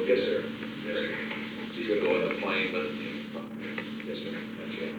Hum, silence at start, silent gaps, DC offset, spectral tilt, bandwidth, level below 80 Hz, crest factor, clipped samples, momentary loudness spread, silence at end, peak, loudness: none; 0 s; none; under 0.1%; -6 dB/octave; over 20 kHz; -66 dBFS; 18 dB; under 0.1%; 10 LU; 0 s; -14 dBFS; -32 LUFS